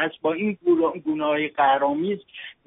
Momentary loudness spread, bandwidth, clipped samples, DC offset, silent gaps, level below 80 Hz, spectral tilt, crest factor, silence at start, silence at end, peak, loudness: 8 LU; 3.9 kHz; under 0.1%; under 0.1%; none; -66 dBFS; -3.5 dB/octave; 16 dB; 0 s; 0.15 s; -8 dBFS; -23 LUFS